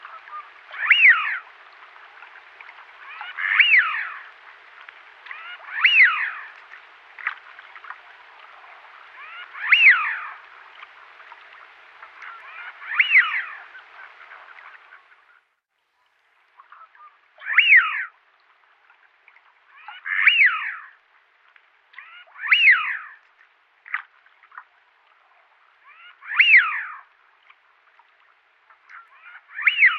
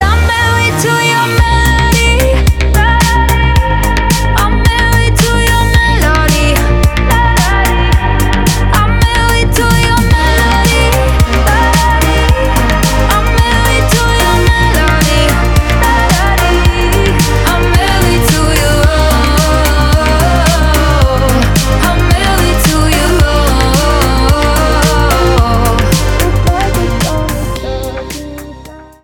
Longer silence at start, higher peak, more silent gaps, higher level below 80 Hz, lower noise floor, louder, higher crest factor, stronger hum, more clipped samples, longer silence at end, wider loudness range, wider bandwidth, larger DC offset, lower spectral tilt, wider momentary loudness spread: about the same, 0.05 s vs 0 s; about the same, -2 dBFS vs 0 dBFS; neither; second, under -90 dBFS vs -12 dBFS; first, -72 dBFS vs -31 dBFS; second, -16 LUFS vs -10 LUFS; first, 22 dB vs 8 dB; neither; second, under 0.1% vs 0.2%; second, 0 s vs 0.2 s; first, 6 LU vs 1 LU; second, 6 kHz vs 19.5 kHz; neither; second, 3 dB/octave vs -4.5 dB/octave; first, 27 LU vs 2 LU